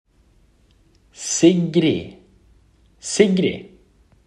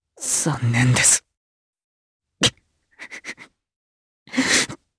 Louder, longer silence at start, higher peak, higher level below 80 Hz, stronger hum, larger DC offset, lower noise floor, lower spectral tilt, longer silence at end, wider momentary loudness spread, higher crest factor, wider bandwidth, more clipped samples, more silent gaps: about the same, -18 LUFS vs -18 LUFS; first, 1.2 s vs 0.2 s; about the same, -2 dBFS vs -2 dBFS; about the same, -56 dBFS vs -54 dBFS; neither; neither; about the same, -56 dBFS vs -57 dBFS; first, -5 dB/octave vs -2.5 dB/octave; first, 0.65 s vs 0.25 s; about the same, 19 LU vs 20 LU; about the same, 20 dB vs 22 dB; about the same, 11 kHz vs 11 kHz; neither; second, none vs 1.37-1.73 s, 1.84-2.20 s, 3.76-4.26 s